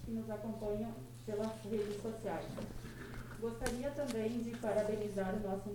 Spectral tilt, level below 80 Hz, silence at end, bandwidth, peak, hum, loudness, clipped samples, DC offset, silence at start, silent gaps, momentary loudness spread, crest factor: -6 dB/octave; -54 dBFS; 0 s; 19 kHz; -18 dBFS; none; -41 LUFS; under 0.1%; under 0.1%; 0 s; none; 10 LU; 22 dB